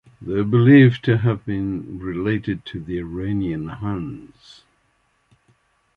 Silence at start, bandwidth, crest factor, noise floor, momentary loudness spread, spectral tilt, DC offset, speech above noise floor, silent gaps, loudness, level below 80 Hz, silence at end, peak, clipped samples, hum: 0.2 s; 5 kHz; 18 dB; -65 dBFS; 17 LU; -9.5 dB/octave; under 0.1%; 46 dB; none; -20 LUFS; -46 dBFS; 1.7 s; -2 dBFS; under 0.1%; none